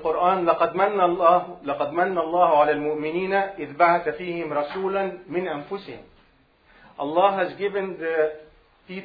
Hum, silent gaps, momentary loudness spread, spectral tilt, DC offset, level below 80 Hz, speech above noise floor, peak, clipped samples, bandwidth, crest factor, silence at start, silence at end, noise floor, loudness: none; none; 12 LU; -9 dB/octave; under 0.1%; -60 dBFS; 37 dB; -4 dBFS; under 0.1%; 5 kHz; 20 dB; 0 s; 0 s; -59 dBFS; -23 LUFS